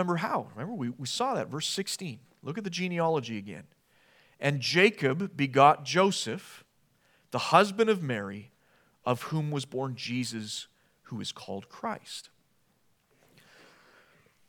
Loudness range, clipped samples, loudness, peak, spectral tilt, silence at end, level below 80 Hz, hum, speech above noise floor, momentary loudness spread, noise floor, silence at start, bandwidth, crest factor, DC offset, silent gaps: 14 LU; under 0.1%; -29 LUFS; -6 dBFS; -4.5 dB/octave; 2.25 s; -80 dBFS; none; 40 dB; 18 LU; -69 dBFS; 0 s; 19 kHz; 24 dB; under 0.1%; none